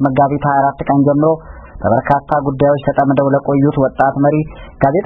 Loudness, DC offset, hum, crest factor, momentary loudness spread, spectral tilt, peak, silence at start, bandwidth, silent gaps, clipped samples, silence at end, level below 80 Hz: -14 LUFS; under 0.1%; none; 14 dB; 5 LU; -11 dB/octave; 0 dBFS; 0 s; 4 kHz; none; under 0.1%; 0 s; -38 dBFS